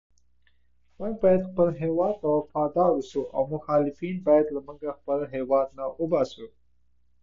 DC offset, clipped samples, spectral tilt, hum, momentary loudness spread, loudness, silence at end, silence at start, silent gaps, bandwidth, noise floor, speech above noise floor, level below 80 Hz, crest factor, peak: under 0.1%; under 0.1%; -8.5 dB/octave; none; 10 LU; -26 LUFS; 0.75 s; 1 s; none; 7.4 kHz; -70 dBFS; 45 dB; -58 dBFS; 18 dB; -8 dBFS